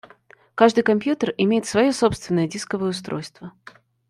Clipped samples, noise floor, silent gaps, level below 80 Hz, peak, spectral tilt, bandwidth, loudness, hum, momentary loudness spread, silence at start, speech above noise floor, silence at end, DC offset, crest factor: under 0.1%; -52 dBFS; none; -54 dBFS; -2 dBFS; -5.5 dB/octave; 12.5 kHz; -21 LUFS; none; 17 LU; 0.55 s; 32 dB; 0.6 s; under 0.1%; 20 dB